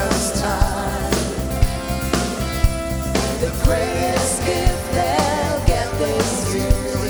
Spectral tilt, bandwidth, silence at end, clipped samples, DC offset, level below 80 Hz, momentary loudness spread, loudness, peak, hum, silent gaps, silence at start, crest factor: -4.5 dB/octave; over 20 kHz; 0 s; under 0.1%; under 0.1%; -24 dBFS; 3 LU; -20 LUFS; -2 dBFS; none; none; 0 s; 18 dB